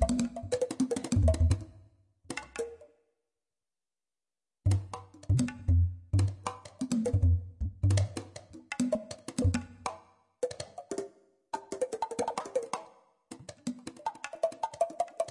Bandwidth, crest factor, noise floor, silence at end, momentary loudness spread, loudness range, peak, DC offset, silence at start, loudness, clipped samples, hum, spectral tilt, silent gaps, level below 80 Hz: 11.5 kHz; 20 dB; under -90 dBFS; 0 s; 14 LU; 7 LU; -14 dBFS; under 0.1%; 0 s; -33 LUFS; under 0.1%; none; -6.5 dB/octave; none; -44 dBFS